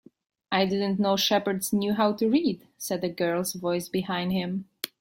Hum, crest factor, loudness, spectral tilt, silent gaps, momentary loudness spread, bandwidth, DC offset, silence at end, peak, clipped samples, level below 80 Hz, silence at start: none; 18 dB; -26 LUFS; -4.5 dB/octave; none; 8 LU; 16.5 kHz; under 0.1%; 0.15 s; -8 dBFS; under 0.1%; -64 dBFS; 0.5 s